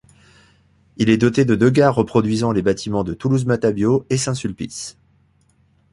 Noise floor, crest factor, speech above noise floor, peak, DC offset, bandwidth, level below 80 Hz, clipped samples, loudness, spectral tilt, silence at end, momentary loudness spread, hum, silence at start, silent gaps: -58 dBFS; 18 dB; 41 dB; -2 dBFS; under 0.1%; 11.5 kHz; -48 dBFS; under 0.1%; -18 LUFS; -6 dB/octave; 1 s; 12 LU; none; 1 s; none